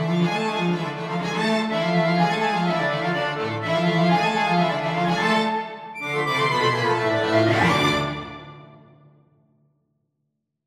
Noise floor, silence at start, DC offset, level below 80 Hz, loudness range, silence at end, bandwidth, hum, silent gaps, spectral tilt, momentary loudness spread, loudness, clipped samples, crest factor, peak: -77 dBFS; 0 s; under 0.1%; -56 dBFS; 2 LU; 1.9 s; 13.5 kHz; none; none; -5.5 dB/octave; 8 LU; -22 LUFS; under 0.1%; 16 dB; -6 dBFS